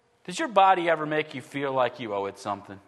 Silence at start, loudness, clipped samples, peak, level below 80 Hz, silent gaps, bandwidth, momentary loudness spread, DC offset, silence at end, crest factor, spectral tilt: 0.3 s; -26 LUFS; under 0.1%; -6 dBFS; -78 dBFS; none; 12 kHz; 14 LU; under 0.1%; 0.1 s; 20 dB; -4.5 dB/octave